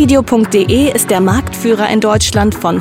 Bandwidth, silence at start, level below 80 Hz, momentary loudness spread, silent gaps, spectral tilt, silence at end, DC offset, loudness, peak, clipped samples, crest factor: 17 kHz; 0 s; -28 dBFS; 3 LU; none; -5 dB/octave; 0 s; 0.1%; -11 LUFS; 0 dBFS; under 0.1%; 10 dB